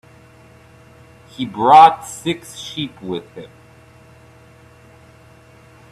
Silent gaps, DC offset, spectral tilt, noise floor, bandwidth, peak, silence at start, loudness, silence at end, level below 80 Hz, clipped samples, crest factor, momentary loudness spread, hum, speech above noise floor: none; under 0.1%; -4.5 dB/octave; -46 dBFS; 13 kHz; 0 dBFS; 1.4 s; -16 LUFS; 2.5 s; -58 dBFS; under 0.1%; 20 dB; 20 LU; none; 31 dB